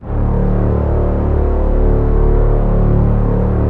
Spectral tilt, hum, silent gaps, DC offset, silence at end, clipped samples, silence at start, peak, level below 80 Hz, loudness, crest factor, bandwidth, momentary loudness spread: -12 dB/octave; none; none; under 0.1%; 0 s; under 0.1%; 0 s; -2 dBFS; -14 dBFS; -15 LUFS; 10 dB; 2.8 kHz; 2 LU